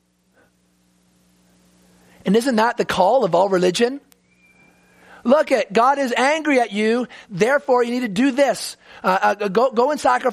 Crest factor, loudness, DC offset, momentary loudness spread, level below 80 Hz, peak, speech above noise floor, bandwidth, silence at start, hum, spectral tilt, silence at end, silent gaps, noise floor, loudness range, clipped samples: 18 dB; -18 LUFS; under 0.1%; 7 LU; -60 dBFS; -2 dBFS; 43 dB; 15 kHz; 2.25 s; none; -4.5 dB/octave; 0 s; none; -61 dBFS; 2 LU; under 0.1%